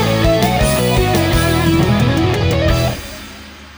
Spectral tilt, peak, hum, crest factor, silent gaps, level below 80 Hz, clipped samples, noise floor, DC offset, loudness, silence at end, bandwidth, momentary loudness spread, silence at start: -5.5 dB/octave; -2 dBFS; none; 14 dB; none; -24 dBFS; under 0.1%; -34 dBFS; under 0.1%; -14 LUFS; 0 s; over 20 kHz; 15 LU; 0 s